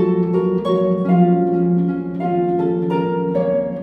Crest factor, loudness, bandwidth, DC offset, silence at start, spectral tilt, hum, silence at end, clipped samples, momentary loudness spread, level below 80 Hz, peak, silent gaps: 14 dB; -18 LUFS; 4.5 kHz; under 0.1%; 0 s; -10.5 dB/octave; none; 0 s; under 0.1%; 5 LU; -52 dBFS; -4 dBFS; none